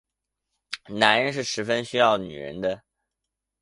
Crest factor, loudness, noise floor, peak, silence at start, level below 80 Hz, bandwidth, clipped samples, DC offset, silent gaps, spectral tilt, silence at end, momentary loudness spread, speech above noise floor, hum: 26 dB; -23 LUFS; -84 dBFS; 0 dBFS; 0.7 s; -62 dBFS; 11.5 kHz; under 0.1%; under 0.1%; none; -3.5 dB/octave; 0.85 s; 17 LU; 61 dB; none